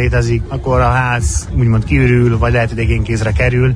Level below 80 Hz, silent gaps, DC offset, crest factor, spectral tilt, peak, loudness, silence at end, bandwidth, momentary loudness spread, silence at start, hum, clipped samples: -20 dBFS; none; under 0.1%; 12 dB; -6.5 dB/octave; -2 dBFS; -14 LUFS; 0 s; 10.5 kHz; 5 LU; 0 s; none; under 0.1%